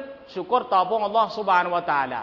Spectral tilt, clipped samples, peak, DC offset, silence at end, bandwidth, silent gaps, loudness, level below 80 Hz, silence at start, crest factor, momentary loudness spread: -5.5 dB/octave; under 0.1%; -6 dBFS; under 0.1%; 0 s; 6 kHz; none; -22 LUFS; -64 dBFS; 0 s; 16 dB; 6 LU